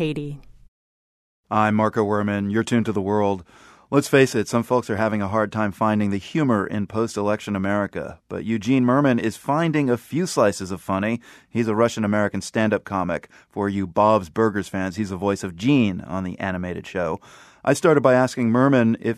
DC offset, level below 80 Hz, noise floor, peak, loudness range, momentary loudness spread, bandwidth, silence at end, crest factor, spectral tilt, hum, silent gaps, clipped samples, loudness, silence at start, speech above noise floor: under 0.1%; -56 dBFS; under -90 dBFS; -2 dBFS; 2 LU; 11 LU; 13.5 kHz; 0 s; 20 dB; -6.5 dB/octave; none; 0.68-1.44 s; under 0.1%; -22 LUFS; 0 s; over 69 dB